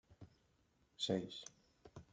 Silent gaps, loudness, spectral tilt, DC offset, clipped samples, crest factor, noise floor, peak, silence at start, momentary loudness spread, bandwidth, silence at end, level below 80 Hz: none; -43 LUFS; -4.5 dB/octave; under 0.1%; under 0.1%; 24 dB; -77 dBFS; -24 dBFS; 0.1 s; 24 LU; 9.4 kHz; 0.1 s; -76 dBFS